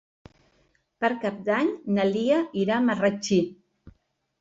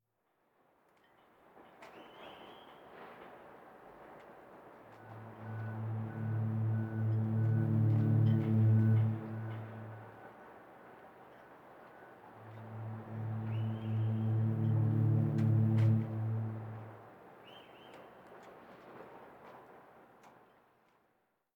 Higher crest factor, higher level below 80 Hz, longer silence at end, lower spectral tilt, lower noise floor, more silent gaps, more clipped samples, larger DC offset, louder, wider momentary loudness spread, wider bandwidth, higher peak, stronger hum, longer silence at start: about the same, 16 dB vs 16 dB; first, -64 dBFS vs -72 dBFS; second, 0.5 s vs 1.25 s; second, -5.5 dB/octave vs -10.5 dB/octave; second, -67 dBFS vs -79 dBFS; neither; neither; neither; first, -25 LUFS vs -34 LUFS; second, 5 LU vs 26 LU; first, 8 kHz vs 3.5 kHz; first, -10 dBFS vs -20 dBFS; neither; second, 1 s vs 1.6 s